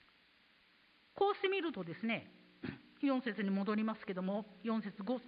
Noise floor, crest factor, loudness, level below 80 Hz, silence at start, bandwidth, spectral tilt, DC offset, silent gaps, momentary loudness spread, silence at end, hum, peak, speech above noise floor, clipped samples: -69 dBFS; 18 dB; -38 LUFS; -78 dBFS; 1.15 s; 5 kHz; -4.5 dB/octave; under 0.1%; none; 13 LU; 0 s; none; -20 dBFS; 31 dB; under 0.1%